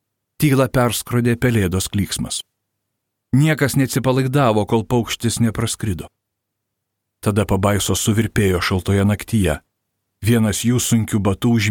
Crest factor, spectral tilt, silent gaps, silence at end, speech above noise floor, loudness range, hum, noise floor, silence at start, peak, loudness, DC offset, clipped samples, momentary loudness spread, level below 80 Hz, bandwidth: 16 dB; -5.5 dB/octave; none; 0 s; 60 dB; 3 LU; none; -78 dBFS; 0.4 s; -4 dBFS; -18 LUFS; under 0.1%; under 0.1%; 6 LU; -40 dBFS; 19 kHz